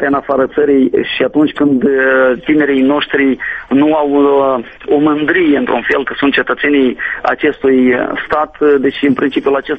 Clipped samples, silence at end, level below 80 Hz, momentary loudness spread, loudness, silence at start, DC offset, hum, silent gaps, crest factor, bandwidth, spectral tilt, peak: under 0.1%; 0 s; -46 dBFS; 5 LU; -12 LUFS; 0 s; under 0.1%; none; none; 12 dB; 5 kHz; -7.5 dB/octave; 0 dBFS